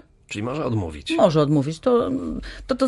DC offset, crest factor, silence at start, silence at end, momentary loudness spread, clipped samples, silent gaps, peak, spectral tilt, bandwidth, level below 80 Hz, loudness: under 0.1%; 18 dB; 0.3 s; 0 s; 13 LU; under 0.1%; none; -4 dBFS; -7 dB/octave; 11.5 kHz; -42 dBFS; -22 LUFS